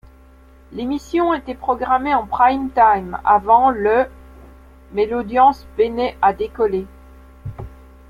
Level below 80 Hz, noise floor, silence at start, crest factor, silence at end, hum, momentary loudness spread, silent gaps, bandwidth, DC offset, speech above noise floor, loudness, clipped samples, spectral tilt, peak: -42 dBFS; -46 dBFS; 0.7 s; 16 dB; 0.35 s; none; 19 LU; none; 12 kHz; under 0.1%; 29 dB; -18 LUFS; under 0.1%; -6.5 dB/octave; -2 dBFS